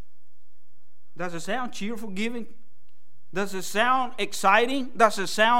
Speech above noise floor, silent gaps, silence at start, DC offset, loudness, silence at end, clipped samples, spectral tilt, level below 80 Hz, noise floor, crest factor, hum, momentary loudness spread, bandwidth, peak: 46 dB; none; 1.15 s; 4%; -25 LUFS; 0 s; under 0.1%; -3 dB/octave; -70 dBFS; -71 dBFS; 22 dB; none; 14 LU; 16 kHz; -4 dBFS